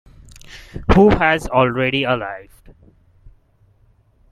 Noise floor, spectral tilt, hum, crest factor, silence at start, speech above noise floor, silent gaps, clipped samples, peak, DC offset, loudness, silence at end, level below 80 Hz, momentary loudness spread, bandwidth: -55 dBFS; -6.5 dB/octave; none; 18 dB; 0.5 s; 39 dB; none; under 0.1%; 0 dBFS; under 0.1%; -16 LUFS; 1.9 s; -32 dBFS; 23 LU; 13 kHz